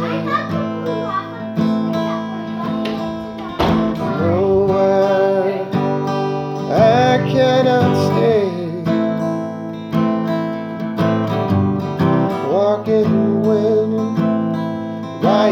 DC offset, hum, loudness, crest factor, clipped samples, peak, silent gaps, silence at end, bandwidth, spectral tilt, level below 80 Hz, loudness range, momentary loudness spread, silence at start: under 0.1%; none; -17 LUFS; 16 dB; under 0.1%; 0 dBFS; none; 0 s; 14.5 kHz; -7.5 dB/octave; -46 dBFS; 5 LU; 9 LU; 0 s